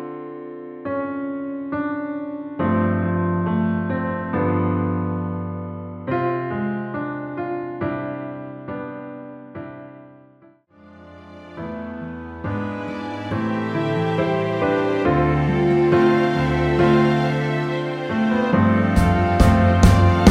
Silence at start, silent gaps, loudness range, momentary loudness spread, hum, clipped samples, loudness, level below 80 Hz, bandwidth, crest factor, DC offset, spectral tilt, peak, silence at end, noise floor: 0 s; none; 15 LU; 17 LU; none; under 0.1%; -21 LUFS; -34 dBFS; 13.5 kHz; 20 dB; under 0.1%; -7.5 dB/octave; 0 dBFS; 0 s; -52 dBFS